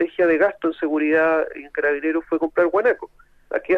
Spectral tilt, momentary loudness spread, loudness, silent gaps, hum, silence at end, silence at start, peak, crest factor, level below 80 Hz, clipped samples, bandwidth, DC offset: -7 dB/octave; 10 LU; -21 LUFS; none; none; 0 s; 0 s; -6 dBFS; 14 dB; -56 dBFS; under 0.1%; 5 kHz; under 0.1%